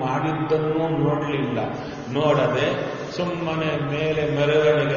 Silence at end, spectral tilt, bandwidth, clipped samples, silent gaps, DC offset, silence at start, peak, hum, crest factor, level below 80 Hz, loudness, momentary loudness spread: 0 s; -5 dB/octave; 7 kHz; under 0.1%; none; under 0.1%; 0 s; -6 dBFS; none; 16 dB; -52 dBFS; -23 LUFS; 8 LU